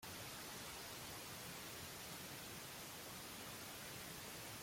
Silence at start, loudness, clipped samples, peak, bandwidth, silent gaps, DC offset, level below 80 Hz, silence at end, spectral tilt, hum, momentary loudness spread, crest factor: 0 s; -50 LUFS; under 0.1%; -40 dBFS; 16.5 kHz; none; under 0.1%; -72 dBFS; 0 s; -2 dB/octave; none; 1 LU; 12 dB